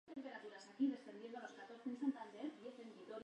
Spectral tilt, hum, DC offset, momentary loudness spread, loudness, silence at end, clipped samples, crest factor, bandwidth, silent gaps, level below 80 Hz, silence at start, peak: -5 dB/octave; none; under 0.1%; 13 LU; -48 LUFS; 0 s; under 0.1%; 18 dB; 9.2 kHz; none; under -90 dBFS; 0.05 s; -30 dBFS